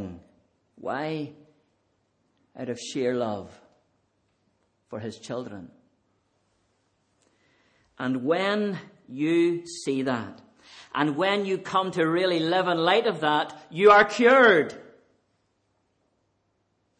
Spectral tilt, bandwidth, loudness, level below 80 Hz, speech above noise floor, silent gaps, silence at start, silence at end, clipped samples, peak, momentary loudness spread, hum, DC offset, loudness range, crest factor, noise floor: -5 dB/octave; 9.8 kHz; -24 LUFS; -70 dBFS; 49 dB; none; 0 s; 2.2 s; under 0.1%; -6 dBFS; 21 LU; none; under 0.1%; 21 LU; 20 dB; -73 dBFS